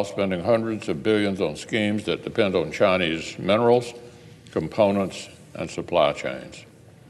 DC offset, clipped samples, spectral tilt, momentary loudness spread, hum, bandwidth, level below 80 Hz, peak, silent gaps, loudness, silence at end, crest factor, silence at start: under 0.1%; under 0.1%; -5.5 dB/octave; 15 LU; none; 12.5 kHz; -56 dBFS; -6 dBFS; none; -23 LUFS; 0.45 s; 18 dB; 0 s